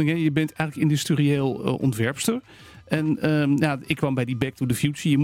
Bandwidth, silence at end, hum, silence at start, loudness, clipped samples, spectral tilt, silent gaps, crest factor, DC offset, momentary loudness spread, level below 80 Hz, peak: 16 kHz; 0 s; none; 0 s; -24 LUFS; under 0.1%; -6 dB/octave; none; 16 dB; under 0.1%; 5 LU; -56 dBFS; -6 dBFS